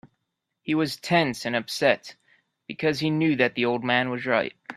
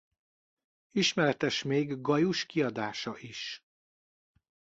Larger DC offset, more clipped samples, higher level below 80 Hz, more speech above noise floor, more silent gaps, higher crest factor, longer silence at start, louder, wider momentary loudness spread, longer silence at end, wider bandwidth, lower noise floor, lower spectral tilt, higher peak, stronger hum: neither; neither; about the same, -66 dBFS vs -70 dBFS; second, 56 dB vs over 60 dB; neither; about the same, 22 dB vs 20 dB; second, 0.05 s vs 0.95 s; first, -24 LUFS vs -31 LUFS; second, 6 LU vs 12 LU; second, 0 s vs 1.15 s; first, 14 kHz vs 8 kHz; second, -80 dBFS vs under -90 dBFS; about the same, -5 dB/octave vs -4.5 dB/octave; first, -4 dBFS vs -12 dBFS; neither